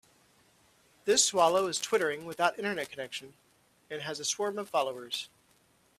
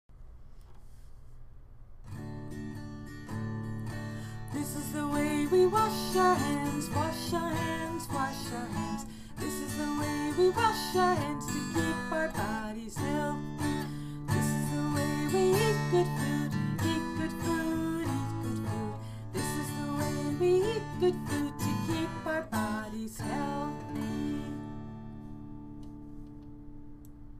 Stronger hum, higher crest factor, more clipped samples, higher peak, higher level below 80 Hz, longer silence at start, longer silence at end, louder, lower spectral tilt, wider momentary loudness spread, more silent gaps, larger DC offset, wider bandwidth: neither; about the same, 22 dB vs 18 dB; neither; first, -10 dBFS vs -14 dBFS; second, -76 dBFS vs -50 dBFS; first, 1.05 s vs 0.1 s; first, 0.75 s vs 0 s; about the same, -30 LUFS vs -32 LUFS; second, -1.5 dB/octave vs -5.5 dB/octave; about the same, 15 LU vs 17 LU; neither; neither; about the same, 15 kHz vs 15.5 kHz